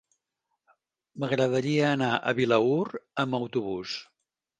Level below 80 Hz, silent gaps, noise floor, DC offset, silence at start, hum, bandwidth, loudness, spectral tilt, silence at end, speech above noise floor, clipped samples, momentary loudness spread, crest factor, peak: -68 dBFS; none; -82 dBFS; under 0.1%; 1.15 s; none; 9.6 kHz; -27 LUFS; -6 dB/octave; 0.55 s; 56 dB; under 0.1%; 10 LU; 20 dB; -8 dBFS